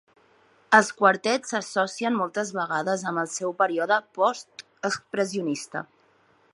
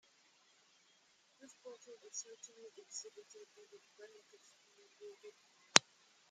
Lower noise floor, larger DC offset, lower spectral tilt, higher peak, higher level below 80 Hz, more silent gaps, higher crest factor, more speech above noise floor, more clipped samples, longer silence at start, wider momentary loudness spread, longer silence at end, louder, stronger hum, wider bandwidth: second, -62 dBFS vs -72 dBFS; neither; first, -3.5 dB/octave vs 0 dB/octave; about the same, -2 dBFS vs 0 dBFS; first, -78 dBFS vs under -90 dBFS; neither; second, 24 dB vs 44 dB; first, 37 dB vs 16 dB; neither; second, 0.7 s vs 1.65 s; second, 12 LU vs 30 LU; first, 0.7 s vs 0.5 s; first, -25 LUFS vs -35 LUFS; neither; second, 11.5 kHz vs 13 kHz